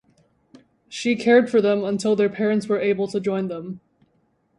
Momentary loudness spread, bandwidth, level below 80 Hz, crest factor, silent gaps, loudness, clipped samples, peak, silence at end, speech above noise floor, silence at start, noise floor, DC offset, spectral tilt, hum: 16 LU; 11 kHz; -66 dBFS; 18 dB; none; -21 LUFS; under 0.1%; -4 dBFS; 0.8 s; 45 dB; 0.9 s; -66 dBFS; under 0.1%; -6 dB/octave; none